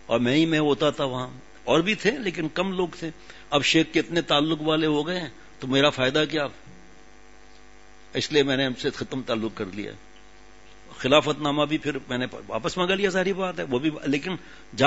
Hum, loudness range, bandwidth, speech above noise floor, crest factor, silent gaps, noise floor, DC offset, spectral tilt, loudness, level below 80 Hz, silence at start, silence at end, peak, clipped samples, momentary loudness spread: none; 5 LU; 8 kHz; 27 dB; 24 dB; none; -52 dBFS; 0.4%; -5 dB/octave; -24 LUFS; -54 dBFS; 0.1 s; 0 s; -2 dBFS; under 0.1%; 13 LU